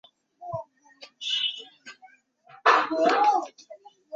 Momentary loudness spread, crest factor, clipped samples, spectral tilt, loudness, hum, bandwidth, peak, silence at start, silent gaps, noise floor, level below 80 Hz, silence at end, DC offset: 20 LU; 22 dB; under 0.1%; -2.5 dB/octave; -23 LUFS; none; 7.8 kHz; -6 dBFS; 0.4 s; none; -57 dBFS; -76 dBFS; 0 s; under 0.1%